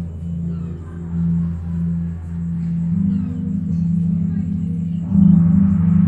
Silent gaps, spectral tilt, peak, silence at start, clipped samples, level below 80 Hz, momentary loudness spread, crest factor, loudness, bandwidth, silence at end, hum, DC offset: none; -11.5 dB/octave; -2 dBFS; 0 s; under 0.1%; -40 dBFS; 13 LU; 16 dB; -19 LUFS; 2.4 kHz; 0 s; none; under 0.1%